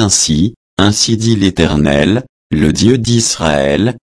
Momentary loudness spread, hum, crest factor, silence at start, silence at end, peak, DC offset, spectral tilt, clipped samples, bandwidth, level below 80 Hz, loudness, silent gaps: 5 LU; none; 12 dB; 0 s; 0.15 s; 0 dBFS; under 0.1%; -4.5 dB/octave; under 0.1%; 11 kHz; -30 dBFS; -12 LUFS; 0.56-0.77 s, 2.29-2.50 s